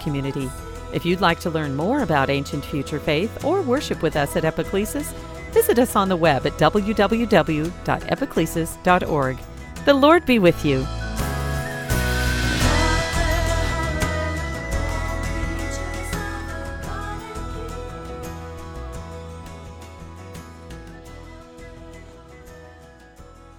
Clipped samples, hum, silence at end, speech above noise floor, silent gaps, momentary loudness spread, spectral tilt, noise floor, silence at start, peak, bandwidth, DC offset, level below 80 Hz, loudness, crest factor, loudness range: under 0.1%; none; 0.1 s; 25 dB; none; 21 LU; -5.5 dB/octave; -45 dBFS; 0 s; 0 dBFS; 19 kHz; under 0.1%; -32 dBFS; -22 LUFS; 22 dB; 18 LU